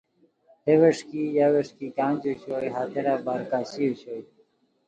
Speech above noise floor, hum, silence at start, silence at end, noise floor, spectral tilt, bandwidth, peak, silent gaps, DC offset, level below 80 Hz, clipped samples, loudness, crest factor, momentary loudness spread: 40 dB; none; 0.65 s; 0.65 s; -65 dBFS; -7 dB/octave; 9 kHz; -6 dBFS; none; under 0.1%; -72 dBFS; under 0.1%; -25 LUFS; 18 dB; 12 LU